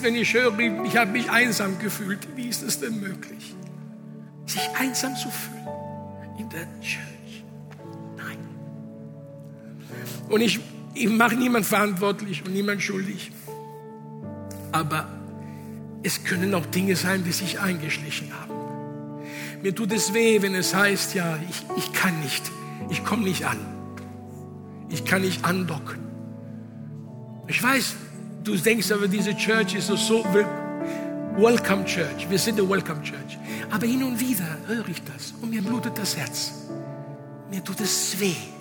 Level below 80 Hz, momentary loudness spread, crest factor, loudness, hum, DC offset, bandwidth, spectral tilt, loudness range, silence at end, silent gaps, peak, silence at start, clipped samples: -70 dBFS; 19 LU; 22 dB; -25 LUFS; none; under 0.1%; over 20 kHz; -4 dB/octave; 7 LU; 0 s; none; -4 dBFS; 0 s; under 0.1%